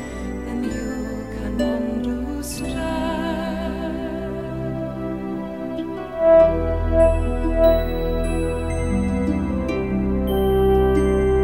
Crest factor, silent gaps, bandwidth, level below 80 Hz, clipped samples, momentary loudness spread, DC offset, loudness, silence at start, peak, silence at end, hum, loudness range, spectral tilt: 16 dB; none; 16 kHz; -28 dBFS; under 0.1%; 11 LU; 0.3%; -22 LUFS; 0 s; -4 dBFS; 0 s; none; 7 LU; -7 dB/octave